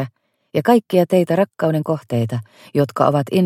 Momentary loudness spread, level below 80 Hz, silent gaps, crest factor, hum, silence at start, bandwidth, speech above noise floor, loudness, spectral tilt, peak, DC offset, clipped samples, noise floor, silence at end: 9 LU; -62 dBFS; none; 18 dB; none; 0 s; 16 kHz; 21 dB; -18 LUFS; -7.5 dB/octave; 0 dBFS; under 0.1%; under 0.1%; -38 dBFS; 0 s